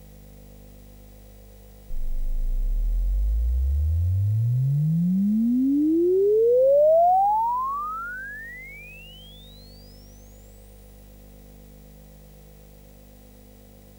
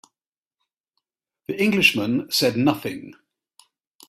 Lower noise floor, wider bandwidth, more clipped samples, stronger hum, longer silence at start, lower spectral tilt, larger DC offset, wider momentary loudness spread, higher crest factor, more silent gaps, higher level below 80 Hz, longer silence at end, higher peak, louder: second, -48 dBFS vs under -90 dBFS; first, 19 kHz vs 16 kHz; neither; first, 50 Hz at -45 dBFS vs none; first, 1.9 s vs 1.5 s; first, -9 dB/octave vs -4 dB/octave; neither; first, 23 LU vs 17 LU; second, 12 dB vs 24 dB; neither; first, -32 dBFS vs -62 dBFS; first, 4.55 s vs 0.95 s; second, -12 dBFS vs -2 dBFS; second, -23 LUFS vs -20 LUFS